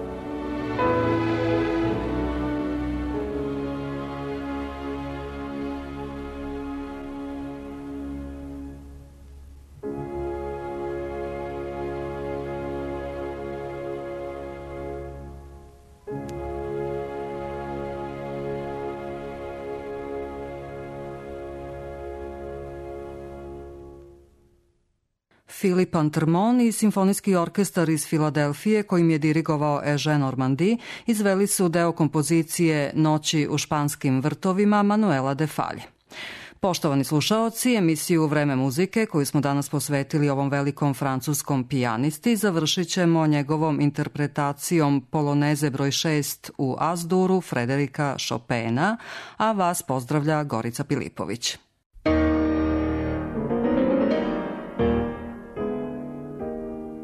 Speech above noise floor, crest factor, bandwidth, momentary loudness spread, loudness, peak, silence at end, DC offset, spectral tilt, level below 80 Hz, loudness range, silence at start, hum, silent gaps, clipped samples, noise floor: 50 dB; 14 dB; 13.5 kHz; 15 LU; -25 LUFS; -10 dBFS; 0 s; under 0.1%; -5.5 dB/octave; -44 dBFS; 13 LU; 0 s; none; 51.86-51.90 s; under 0.1%; -72 dBFS